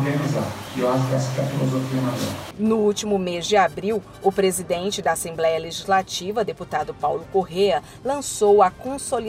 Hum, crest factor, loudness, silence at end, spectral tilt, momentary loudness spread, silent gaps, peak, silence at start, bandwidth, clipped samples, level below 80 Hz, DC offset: none; 18 dB; -22 LUFS; 0 s; -5 dB/octave; 7 LU; none; -4 dBFS; 0 s; 16 kHz; under 0.1%; -52 dBFS; under 0.1%